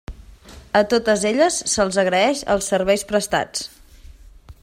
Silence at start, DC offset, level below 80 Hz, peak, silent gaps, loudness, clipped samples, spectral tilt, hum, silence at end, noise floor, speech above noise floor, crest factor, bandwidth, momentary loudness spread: 0.1 s; under 0.1%; -44 dBFS; -4 dBFS; none; -19 LUFS; under 0.1%; -3 dB/octave; none; 0.1 s; -44 dBFS; 25 dB; 18 dB; 16 kHz; 5 LU